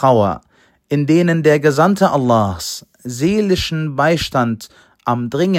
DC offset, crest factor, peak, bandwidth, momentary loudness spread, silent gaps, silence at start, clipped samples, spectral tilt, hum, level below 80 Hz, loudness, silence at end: under 0.1%; 16 dB; 0 dBFS; 16.5 kHz; 12 LU; none; 0 s; under 0.1%; -6 dB/octave; none; -44 dBFS; -16 LUFS; 0 s